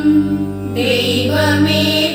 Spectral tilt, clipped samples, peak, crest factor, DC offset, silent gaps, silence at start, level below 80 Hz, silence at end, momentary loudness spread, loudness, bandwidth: -5 dB/octave; under 0.1%; -2 dBFS; 12 dB; under 0.1%; none; 0 s; -44 dBFS; 0 s; 6 LU; -14 LUFS; 17 kHz